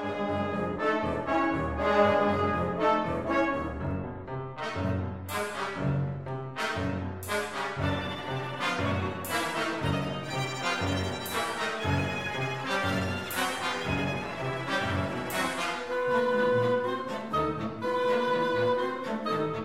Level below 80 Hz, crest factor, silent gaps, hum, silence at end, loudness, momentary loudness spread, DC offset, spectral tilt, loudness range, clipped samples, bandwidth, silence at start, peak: -52 dBFS; 18 dB; none; none; 0 s; -30 LUFS; 7 LU; 0.2%; -5.5 dB/octave; 5 LU; under 0.1%; 16 kHz; 0 s; -12 dBFS